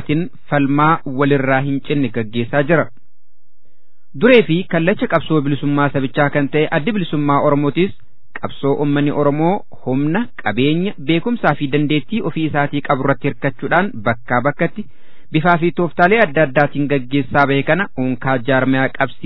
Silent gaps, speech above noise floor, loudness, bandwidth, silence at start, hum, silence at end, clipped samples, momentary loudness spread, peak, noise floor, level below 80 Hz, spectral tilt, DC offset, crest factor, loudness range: none; 53 dB; -16 LUFS; 5.4 kHz; 0 s; none; 0.15 s; under 0.1%; 7 LU; 0 dBFS; -69 dBFS; -48 dBFS; -10 dB/octave; 5%; 16 dB; 3 LU